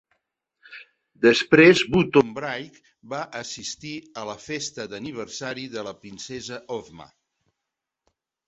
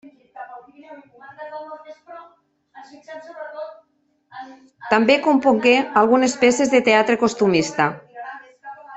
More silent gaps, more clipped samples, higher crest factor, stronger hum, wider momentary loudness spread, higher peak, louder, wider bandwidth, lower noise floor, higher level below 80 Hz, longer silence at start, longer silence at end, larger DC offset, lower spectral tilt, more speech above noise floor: neither; neither; about the same, 22 dB vs 18 dB; neither; second, 21 LU vs 24 LU; about the same, -2 dBFS vs -2 dBFS; second, -22 LUFS vs -17 LUFS; about the same, 8.2 kHz vs 8.4 kHz; first, -84 dBFS vs -43 dBFS; about the same, -58 dBFS vs -62 dBFS; first, 0.7 s vs 0.05 s; first, 1.45 s vs 0 s; neither; about the same, -4.5 dB/octave vs -4 dB/octave; first, 61 dB vs 25 dB